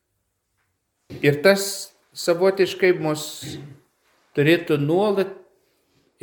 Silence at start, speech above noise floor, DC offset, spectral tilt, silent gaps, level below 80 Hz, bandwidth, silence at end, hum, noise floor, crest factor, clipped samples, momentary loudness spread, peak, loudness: 1.1 s; 54 dB; under 0.1%; -5 dB/octave; none; -66 dBFS; 19 kHz; 0.85 s; none; -74 dBFS; 20 dB; under 0.1%; 14 LU; -2 dBFS; -21 LUFS